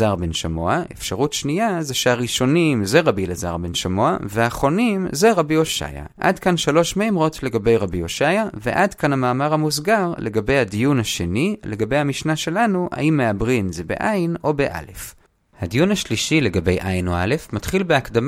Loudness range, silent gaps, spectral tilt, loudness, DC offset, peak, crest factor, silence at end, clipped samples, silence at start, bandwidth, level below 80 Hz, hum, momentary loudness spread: 2 LU; none; -5 dB/octave; -20 LUFS; under 0.1%; -2 dBFS; 18 dB; 0 s; under 0.1%; 0 s; 16.5 kHz; -40 dBFS; none; 6 LU